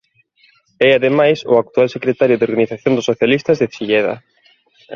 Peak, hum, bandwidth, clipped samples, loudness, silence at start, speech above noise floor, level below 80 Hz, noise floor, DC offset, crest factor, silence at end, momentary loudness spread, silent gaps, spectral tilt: 0 dBFS; none; 7 kHz; under 0.1%; -15 LUFS; 0.8 s; 40 dB; -56 dBFS; -55 dBFS; under 0.1%; 16 dB; 0 s; 5 LU; none; -6 dB/octave